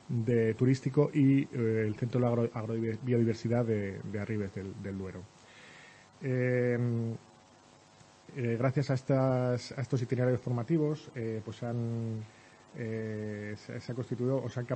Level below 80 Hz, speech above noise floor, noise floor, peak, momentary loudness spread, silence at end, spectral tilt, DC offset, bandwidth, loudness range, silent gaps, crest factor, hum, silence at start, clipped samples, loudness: -68 dBFS; 28 dB; -59 dBFS; -12 dBFS; 13 LU; 0 s; -8.5 dB/octave; under 0.1%; 8.6 kHz; 6 LU; none; 18 dB; none; 0.1 s; under 0.1%; -32 LUFS